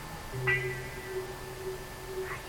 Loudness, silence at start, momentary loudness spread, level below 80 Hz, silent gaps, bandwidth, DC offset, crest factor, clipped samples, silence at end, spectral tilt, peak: -35 LUFS; 0 s; 11 LU; -50 dBFS; none; 17 kHz; under 0.1%; 20 dB; under 0.1%; 0 s; -4.5 dB/octave; -16 dBFS